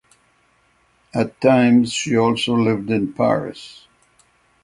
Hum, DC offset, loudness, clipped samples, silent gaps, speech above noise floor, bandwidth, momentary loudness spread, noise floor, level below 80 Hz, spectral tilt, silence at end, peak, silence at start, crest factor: none; under 0.1%; -18 LUFS; under 0.1%; none; 42 dB; 11 kHz; 14 LU; -60 dBFS; -56 dBFS; -5.5 dB/octave; 0.9 s; 0 dBFS; 1.15 s; 20 dB